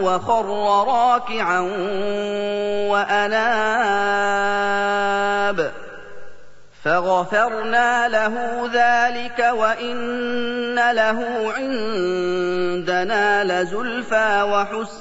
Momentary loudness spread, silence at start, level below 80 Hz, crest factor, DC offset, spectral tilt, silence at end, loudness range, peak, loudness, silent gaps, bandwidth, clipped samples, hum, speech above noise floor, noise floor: 6 LU; 0 s; -58 dBFS; 16 dB; 2%; -4 dB/octave; 0 s; 2 LU; -4 dBFS; -20 LUFS; none; 8 kHz; under 0.1%; 50 Hz at -60 dBFS; 24 dB; -43 dBFS